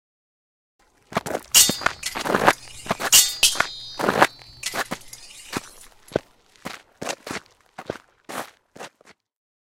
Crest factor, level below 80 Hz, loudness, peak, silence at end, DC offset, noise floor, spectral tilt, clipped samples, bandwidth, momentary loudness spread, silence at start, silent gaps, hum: 24 dB; -54 dBFS; -20 LUFS; 0 dBFS; 0.9 s; under 0.1%; -56 dBFS; -0.5 dB/octave; under 0.1%; 17 kHz; 25 LU; 1.1 s; none; none